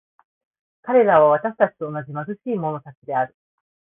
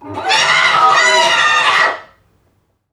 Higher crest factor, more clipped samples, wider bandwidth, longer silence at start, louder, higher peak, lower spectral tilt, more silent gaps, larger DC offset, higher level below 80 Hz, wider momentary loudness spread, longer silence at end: about the same, 18 dB vs 14 dB; neither; second, 3.7 kHz vs 14.5 kHz; first, 0.85 s vs 0 s; second, -20 LUFS vs -10 LUFS; about the same, -2 dBFS vs 0 dBFS; first, -11.5 dB/octave vs 0 dB/octave; first, 2.97-3.02 s vs none; neither; about the same, -66 dBFS vs -62 dBFS; first, 15 LU vs 6 LU; second, 0.7 s vs 0.9 s